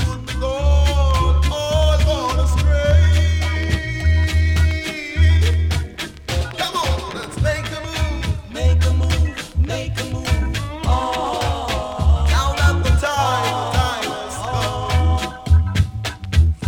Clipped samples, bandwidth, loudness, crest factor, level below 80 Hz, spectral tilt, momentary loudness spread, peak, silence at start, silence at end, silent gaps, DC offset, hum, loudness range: under 0.1%; 14 kHz; -19 LUFS; 14 dB; -20 dBFS; -5.5 dB/octave; 8 LU; -4 dBFS; 0 s; 0 s; none; under 0.1%; none; 4 LU